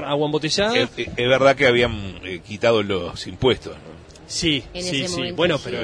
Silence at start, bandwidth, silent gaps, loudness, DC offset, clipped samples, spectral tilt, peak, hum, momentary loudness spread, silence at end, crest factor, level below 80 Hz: 0 s; 10.5 kHz; none; -20 LUFS; under 0.1%; under 0.1%; -4 dB/octave; -4 dBFS; none; 14 LU; 0 s; 18 dB; -44 dBFS